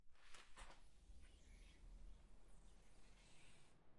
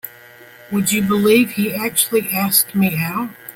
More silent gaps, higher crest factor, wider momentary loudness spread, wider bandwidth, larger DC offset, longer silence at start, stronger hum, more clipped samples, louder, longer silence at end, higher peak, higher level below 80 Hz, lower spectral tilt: neither; about the same, 18 dB vs 18 dB; second, 5 LU vs 9 LU; second, 11 kHz vs 17 kHz; neither; about the same, 0 s vs 0.05 s; neither; neither; second, -67 LUFS vs -16 LUFS; about the same, 0 s vs 0.05 s; second, -42 dBFS vs 0 dBFS; second, -66 dBFS vs -56 dBFS; about the same, -3.5 dB/octave vs -4 dB/octave